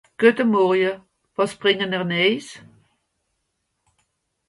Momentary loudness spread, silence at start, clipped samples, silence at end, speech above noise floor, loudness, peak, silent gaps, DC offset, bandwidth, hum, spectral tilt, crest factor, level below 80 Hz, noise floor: 15 LU; 0.2 s; under 0.1%; 1.9 s; 55 dB; -20 LUFS; -2 dBFS; none; under 0.1%; 11.5 kHz; none; -5.5 dB/octave; 22 dB; -68 dBFS; -75 dBFS